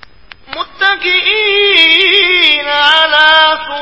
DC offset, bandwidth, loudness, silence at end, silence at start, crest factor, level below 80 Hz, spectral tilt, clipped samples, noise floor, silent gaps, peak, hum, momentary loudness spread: 0.9%; 8 kHz; -7 LUFS; 0 s; 0.5 s; 10 dB; -48 dBFS; -1.5 dB/octave; 0.4%; -38 dBFS; none; 0 dBFS; none; 8 LU